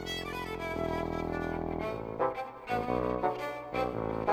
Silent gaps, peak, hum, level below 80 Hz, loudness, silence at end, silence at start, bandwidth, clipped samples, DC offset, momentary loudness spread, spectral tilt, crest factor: none; -14 dBFS; none; -50 dBFS; -34 LUFS; 0 s; 0 s; over 20 kHz; under 0.1%; under 0.1%; 5 LU; -6 dB/octave; 20 dB